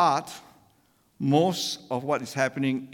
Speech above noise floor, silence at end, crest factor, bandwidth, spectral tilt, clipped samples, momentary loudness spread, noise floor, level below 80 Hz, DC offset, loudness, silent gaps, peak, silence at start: 39 dB; 0 s; 18 dB; 18.5 kHz; -5 dB/octave; under 0.1%; 9 LU; -64 dBFS; -72 dBFS; under 0.1%; -26 LUFS; none; -8 dBFS; 0 s